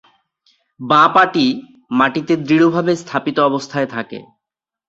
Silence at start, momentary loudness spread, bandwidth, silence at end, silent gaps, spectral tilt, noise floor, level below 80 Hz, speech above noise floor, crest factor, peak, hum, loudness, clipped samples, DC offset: 0.8 s; 16 LU; 7.8 kHz; 0.65 s; none; -5.5 dB/octave; -85 dBFS; -60 dBFS; 70 dB; 16 dB; 0 dBFS; none; -15 LUFS; under 0.1%; under 0.1%